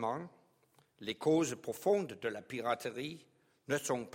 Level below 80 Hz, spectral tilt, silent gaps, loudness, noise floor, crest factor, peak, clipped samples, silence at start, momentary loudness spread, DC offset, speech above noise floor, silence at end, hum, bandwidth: -78 dBFS; -4.5 dB/octave; none; -36 LUFS; -71 dBFS; 18 dB; -18 dBFS; under 0.1%; 0 s; 14 LU; under 0.1%; 35 dB; 0.05 s; none; 16.5 kHz